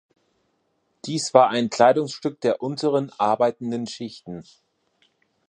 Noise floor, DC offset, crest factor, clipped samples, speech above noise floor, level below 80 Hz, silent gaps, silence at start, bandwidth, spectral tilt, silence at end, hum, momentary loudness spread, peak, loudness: -70 dBFS; under 0.1%; 22 dB; under 0.1%; 49 dB; -70 dBFS; none; 1.05 s; 11.5 kHz; -5 dB/octave; 1.05 s; none; 18 LU; 0 dBFS; -22 LUFS